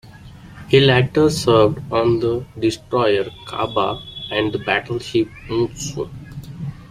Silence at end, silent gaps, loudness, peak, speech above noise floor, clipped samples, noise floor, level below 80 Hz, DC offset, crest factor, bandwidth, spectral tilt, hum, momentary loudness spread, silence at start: 0.05 s; none; -19 LUFS; 0 dBFS; 22 dB; under 0.1%; -40 dBFS; -46 dBFS; under 0.1%; 18 dB; 15 kHz; -5.5 dB/octave; none; 16 LU; 0.05 s